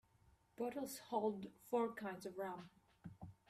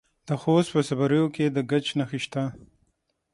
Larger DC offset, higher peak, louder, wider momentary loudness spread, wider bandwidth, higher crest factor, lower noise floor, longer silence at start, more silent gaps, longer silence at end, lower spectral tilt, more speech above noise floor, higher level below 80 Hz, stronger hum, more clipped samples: neither; second, -26 dBFS vs -8 dBFS; second, -45 LUFS vs -25 LUFS; first, 17 LU vs 8 LU; first, 15.5 kHz vs 11.5 kHz; about the same, 20 dB vs 18 dB; about the same, -73 dBFS vs -73 dBFS; first, 0.6 s vs 0.25 s; neither; second, 0.15 s vs 0.7 s; about the same, -5.5 dB/octave vs -6.5 dB/octave; second, 29 dB vs 49 dB; second, -78 dBFS vs -64 dBFS; neither; neither